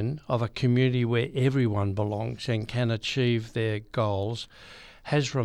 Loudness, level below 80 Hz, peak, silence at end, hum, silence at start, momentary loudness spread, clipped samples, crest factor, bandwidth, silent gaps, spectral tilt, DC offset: -27 LUFS; -54 dBFS; -12 dBFS; 0 s; none; 0 s; 9 LU; under 0.1%; 14 dB; 10 kHz; none; -6.5 dB/octave; under 0.1%